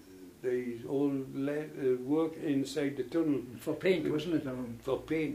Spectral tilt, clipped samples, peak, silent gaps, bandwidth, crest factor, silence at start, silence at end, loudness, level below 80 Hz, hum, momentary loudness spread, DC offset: -6.5 dB/octave; under 0.1%; -16 dBFS; none; 15.5 kHz; 16 dB; 0 s; 0 s; -33 LUFS; -64 dBFS; none; 6 LU; under 0.1%